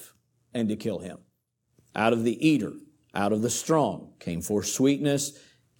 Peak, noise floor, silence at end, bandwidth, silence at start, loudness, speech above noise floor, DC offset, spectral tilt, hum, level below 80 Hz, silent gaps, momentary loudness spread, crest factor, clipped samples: -8 dBFS; -74 dBFS; 0.5 s; 19 kHz; 0 s; -27 LUFS; 48 dB; under 0.1%; -5 dB/octave; none; -66 dBFS; none; 13 LU; 20 dB; under 0.1%